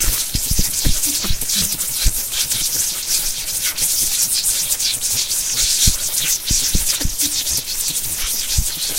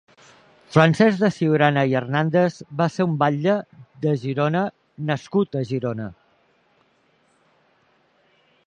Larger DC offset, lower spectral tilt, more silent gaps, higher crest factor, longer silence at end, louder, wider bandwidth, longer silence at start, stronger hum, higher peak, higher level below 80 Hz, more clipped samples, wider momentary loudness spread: neither; second, -0.5 dB/octave vs -7.5 dB/octave; neither; about the same, 18 dB vs 22 dB; second, 0 s vs 2.55 s; first, -16 LUFS vs -21 LUFS; first, 16 kHz vs 9.8 kHz; second, 0 s vs 0.7 s; neither; about the same, 0 dBFS vs 0 dBFS; first, -28 dBFS vs -64 dBFS; neither; second, 4 LU vs 10 LU